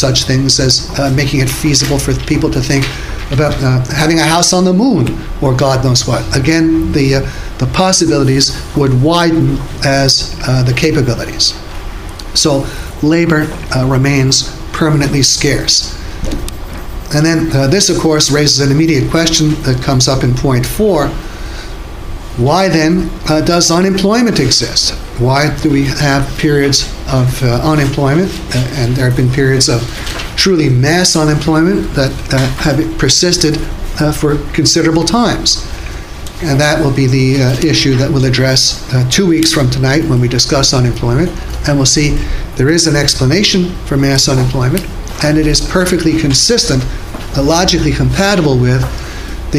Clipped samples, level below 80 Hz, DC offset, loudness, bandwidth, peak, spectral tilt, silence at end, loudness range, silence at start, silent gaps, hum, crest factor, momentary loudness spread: under 0.1%; -24 dBFS; under 0.1%; -11 LUFS; 16 kHz; 0 dBFS; -4.5 dB/octave; 0 s; 2 LU; 0 s; none; none; 12 dB; 10 LU